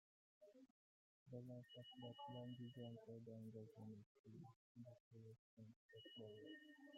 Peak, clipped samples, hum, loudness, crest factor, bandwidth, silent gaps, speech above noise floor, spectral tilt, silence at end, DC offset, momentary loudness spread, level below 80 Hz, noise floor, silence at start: -42 dBFS; under 0.1%; none; -60 LUFS; 18 dB; 7.6 kHz; 0.70-1.26 s, 4.06-4.24 s, 4.56-4.75 s, 5.00-5.11 s, 5.39-5.57 s, 5.76-5.89 s; over 31 dB; -5.5 dB/octave; 0 s; under 0.1%; 10 LU; under -90 dBFS; under -90 dBFS; 0.4 s